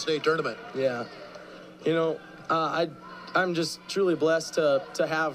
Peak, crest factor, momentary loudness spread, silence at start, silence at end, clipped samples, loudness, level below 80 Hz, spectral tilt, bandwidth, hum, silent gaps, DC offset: -12 dBFS; 16 dB; 15 LU; 0 s; 0 s; under 0.1%; -27 LUFS; -70 dBFS; -4.5 dB/octave; 15.5 kHz; none; none; under 0.1%